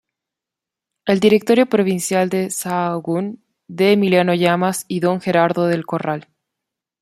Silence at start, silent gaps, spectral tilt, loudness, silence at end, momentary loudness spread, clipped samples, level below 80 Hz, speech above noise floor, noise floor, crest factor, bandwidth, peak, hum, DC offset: 1.05 s; none; -5.5 dB/octave; -17 LUFS; 0.8 s; 9 LU; under 0.1%; -62 dBFS; 69 dB; -86 dBFS; 16 dB; 15.5 kHz; -2 dBFS; none; under 0.1%